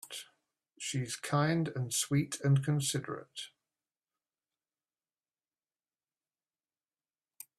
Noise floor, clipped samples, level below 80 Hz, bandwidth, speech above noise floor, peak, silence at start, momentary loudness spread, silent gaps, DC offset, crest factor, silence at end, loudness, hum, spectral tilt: under -90 dBFS; under 0.1%; -72 dBFS; 14.5 kHz; over 58 dB; -16 dBFS; 0.05 s; 16 LU; none; under 0.1%; 20 dB; 4.1 s; -33 LUFS; none; -4.5 dB/octave